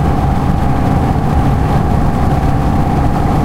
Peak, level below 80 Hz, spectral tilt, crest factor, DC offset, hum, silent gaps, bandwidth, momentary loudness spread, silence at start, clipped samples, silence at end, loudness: 0 dBFS; -18 dBFS; -8 dB/octave; 12 dB; under 0.1%; none; none; 15.5 kHz; 1 LU; 0 s; under 0.1%; 0 s; -14 LUFS